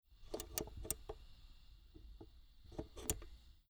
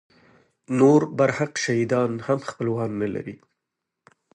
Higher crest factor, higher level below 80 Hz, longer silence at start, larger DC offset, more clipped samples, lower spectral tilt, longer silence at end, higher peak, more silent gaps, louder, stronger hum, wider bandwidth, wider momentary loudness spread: first, 32 dB vs 20 dB; first, -56 dBFS vs -64 dBFS; second, 0.05 s vs 0.7 s; neither; neither; second, -3 dB/octave vs -6 dB/octave; second, 0.05 s vs 1 s; second, -18 dBFS vs -4 dBFS; neither; second, -47 LUFS vs -23 LUFS; neither; first, over 20 kHz vs 11 kHz; first, 21 LU vs 11 LU